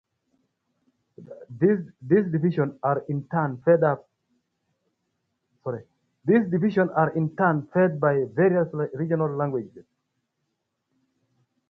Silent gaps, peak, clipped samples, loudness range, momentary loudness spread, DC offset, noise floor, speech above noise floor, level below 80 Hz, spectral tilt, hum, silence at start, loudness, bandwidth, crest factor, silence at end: none; -6 dBFS; under 0.1%; 5 LU; 12 LU; under 0.1%; -78 dBFS; 55 dB; -68 dBFS; -11 dB/octave; none; 1.2 s; -24 LUFS; 4.7 kHz; 18 dB; 1.9 s